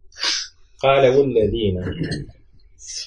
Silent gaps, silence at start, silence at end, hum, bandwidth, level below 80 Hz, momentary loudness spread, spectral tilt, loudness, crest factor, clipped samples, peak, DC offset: none; 0.05 s; 0 s; none; 11 kHz; -42 dBFS; 18 LU; -4.5 dB/octave; -19 LUFS; 18 dB; under 0.1%; -2 dBFS; under 0.1%